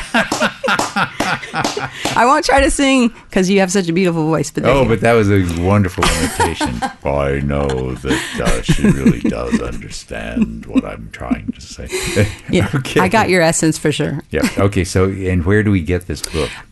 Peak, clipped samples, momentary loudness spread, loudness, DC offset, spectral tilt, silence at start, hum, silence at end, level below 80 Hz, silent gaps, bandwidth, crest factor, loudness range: 0 dBFS; under 0.1%; 9 LU; -16 LUFS; under 0.1%; -5 dB/octave; 0 s; none; 0.05 s; -30 dBFS; none; 12.5 kHz; 14 dB; 5 LU